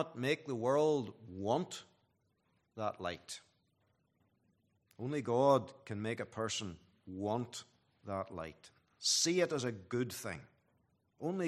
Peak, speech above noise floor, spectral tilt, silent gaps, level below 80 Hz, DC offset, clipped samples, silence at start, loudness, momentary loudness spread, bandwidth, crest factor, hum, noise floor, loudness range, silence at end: -16 dBFS; 42 dB; -4 dB/octave; none; -78 dBFS; under 0.1%; under 0.1%; 0 s; -36 LUFS; 18 LU; 14 kHz; 22 dB; none; -78 dBFS; 7 LU; 0 s